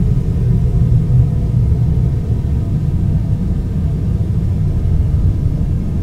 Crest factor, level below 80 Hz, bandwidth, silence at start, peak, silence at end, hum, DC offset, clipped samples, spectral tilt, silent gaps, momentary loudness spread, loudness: 14 dB; -20 dBFS; 6 kHz; 0 s; 0 dBFS; 0 s; none; under 0.1%; under 0.1%; -10 dB/octave; none; 4 LU; -16 LUFS